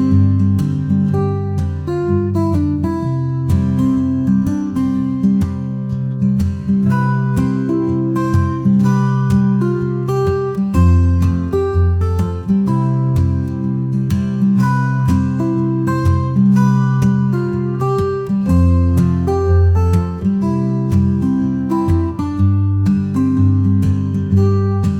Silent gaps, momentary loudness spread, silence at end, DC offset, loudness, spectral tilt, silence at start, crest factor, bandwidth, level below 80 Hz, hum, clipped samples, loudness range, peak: none; 5 LU; 0 s; under 0.1%; -16 LUFS; -9.5 dB/octave; 0 s; 12 dB; 9.8 kHz; -36 dBFS; none; under 0.1%; 2 LU; -2 dBFS